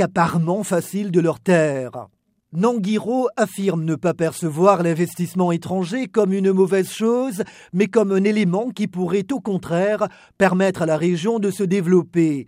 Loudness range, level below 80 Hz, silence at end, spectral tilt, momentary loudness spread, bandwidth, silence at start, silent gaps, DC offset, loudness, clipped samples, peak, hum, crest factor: 2 LU; -62 dBFS; 0.05 s; -6.5 dB/octave; 7 LU; 16 kHz; 0 s; none; under 0.1%; -20 LUFS; under 0.1%; -2 dBFS; none; 18 dB